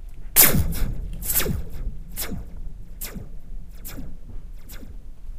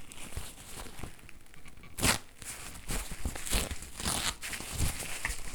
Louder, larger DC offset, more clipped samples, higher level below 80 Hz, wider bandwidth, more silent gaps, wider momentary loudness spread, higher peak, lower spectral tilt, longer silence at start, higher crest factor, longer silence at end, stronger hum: first, -21 LUFS vs -35 LUFS; neither; neither; first, -32 dBFS vs -42 dBFS; second, 16 kHz vs over 20 kHz; neither; first, 28 LU vs 18 LU; first, 0 dBFS vs -10 dBFS; about the same, -2.5 dB/octave vs -2.5 dB/octave; about the same, 0 s vs 0 s; about the same, 24 dB vs 26 dB; about the same, 0 s vs 0 s; neither